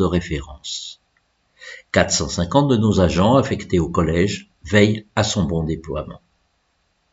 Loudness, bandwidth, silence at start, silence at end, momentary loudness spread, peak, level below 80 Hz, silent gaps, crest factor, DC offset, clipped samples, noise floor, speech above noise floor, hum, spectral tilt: -19 LUFS; 8 kHz; 0 s; 0.95 s; 13 LU; 0 dBFS; -38 dBFS; none; 20 dB; under 0.1%; under 0.1%; -66 dBFS; 48 dB; none; -5 dB/octave